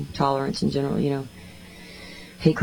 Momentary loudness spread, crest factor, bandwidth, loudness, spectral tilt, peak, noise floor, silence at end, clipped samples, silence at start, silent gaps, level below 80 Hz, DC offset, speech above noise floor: 19 LU; 22 dB; 19.5 kHz; -25 LUFS; -7 dB/octave; -4 dBFS; -43 dBFS; 0 s; under 0.1%; 0 s; none; -50 dBFS; under 0.1%; 19 dB